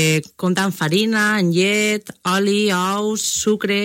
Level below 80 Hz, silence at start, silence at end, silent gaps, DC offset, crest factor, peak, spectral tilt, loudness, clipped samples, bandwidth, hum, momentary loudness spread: -60 dBFS; 0 s; 0 s; none; under 0.1%; 14 dB; -4 dBFS; -4 dB/octave; -18 LUFS; under 0.1%; 16.5 kHz; none; 4 LU